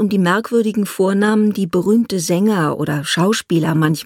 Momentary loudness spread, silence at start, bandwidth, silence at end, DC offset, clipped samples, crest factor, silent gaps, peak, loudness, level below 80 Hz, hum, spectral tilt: 3 LU; 0 s; 16.5 kHz; 0 s; under 0.1%; under 0.1%; 12 dB; none; -4 dBFS; -16 LUFS; -58 dBFS; none; -5.5 dB/octave